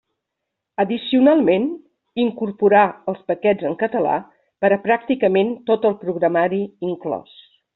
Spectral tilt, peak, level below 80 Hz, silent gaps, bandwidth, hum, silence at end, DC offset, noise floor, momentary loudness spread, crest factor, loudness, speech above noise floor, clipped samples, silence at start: -4.5 dB/octave; -2 dBFS; -64 dBFS; none; 4.2 kHz; none; 0.55 s; under 0.1%; -80 dBFS; 12 LU; 16 dB; -19 LUFS; 62 dB; under 0.1%; 0.8 s